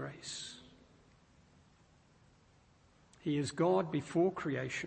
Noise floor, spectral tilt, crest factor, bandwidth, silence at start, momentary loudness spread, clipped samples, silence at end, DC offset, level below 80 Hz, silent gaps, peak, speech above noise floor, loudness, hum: -66 dBFS; -5.5 dB/octave; 18 dB; 8.4 kHz; 0 s; 13 LU; under 0.1%; 0 s; under 0.1%; -72 dBFS; none; -20 dBFS; 32 dB; -35 LUFS; none